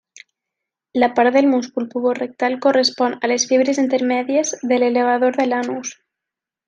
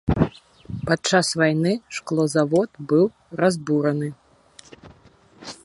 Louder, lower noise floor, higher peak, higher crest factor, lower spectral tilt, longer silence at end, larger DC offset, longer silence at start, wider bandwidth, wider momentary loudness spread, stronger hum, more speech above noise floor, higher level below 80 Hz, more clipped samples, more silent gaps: first, -18 LUFS vs -22 LUFS; first, -85 dBFS vs -53 dBFS; about the same, -2 dBFS vs -2 dBFS; about the same, 16 dB vs 20 dB; second, -2.5 dB/octave vs -5.5 dB/octave; first, 0.75 s vs 0.1 s; neither; first, 0.95 s vs 0.05 s; second, 9.6 kHz vs 11.5 kHz; second, 7 LU vs 12 LU; neither; first, 68 dB vs 32 dB; second, -70 dBFS vs -44 dBFS; neither; neither